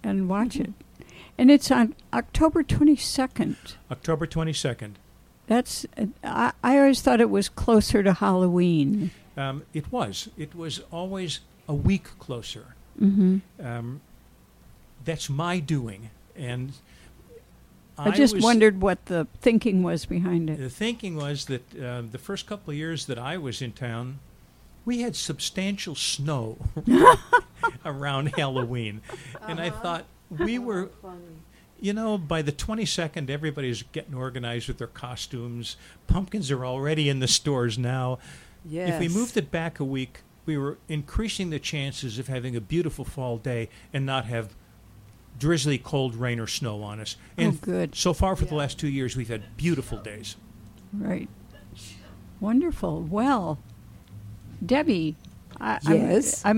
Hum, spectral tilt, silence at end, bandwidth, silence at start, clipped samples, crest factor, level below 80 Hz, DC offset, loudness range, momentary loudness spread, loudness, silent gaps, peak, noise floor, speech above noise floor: none; -5.5 dB/octave; 0 s; 16.5 kHz; 0.05 s; under 0.1%; 26 dB; -44 dBFS; under 0.1%; 10 LU; 17 LU; -25 LUFS; none; 0 dBFS; -54 dBFS; 29 dB